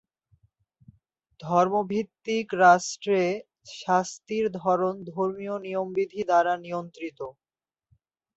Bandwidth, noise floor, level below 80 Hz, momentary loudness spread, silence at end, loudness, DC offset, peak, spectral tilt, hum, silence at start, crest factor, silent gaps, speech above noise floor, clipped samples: 8.2 kHz; -71 dBFS; -70 dBFS; 16 LU; 1.05 s; -26 LUFS; under 0.1%; -6 dBFS; -5 dB/octave; none; 1.4 s; 20 dB; none; 45 dB; under 0.1%